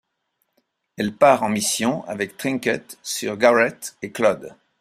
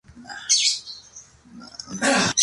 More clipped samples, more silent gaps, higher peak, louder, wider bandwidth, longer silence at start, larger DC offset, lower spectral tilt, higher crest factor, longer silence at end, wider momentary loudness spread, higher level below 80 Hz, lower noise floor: neither; neither; about the same, -2 dBFS vs -4 dBFS; about the same, -21 LUFS vs -20 LUFS; first, 15.5 kHz vs 11.5 kHz; first, 1 s vs 0.15 s; neither; first, -3.5 dB/octave vs -1 dB/octave; about the same, 20 dB vs 22 dB; first, 0.3 s vs 0 s; second, 12 LU vs 21 LU; about the same, -64 dBFS vs -60 dBFS; first, -73 dBFS vs -47 dBFS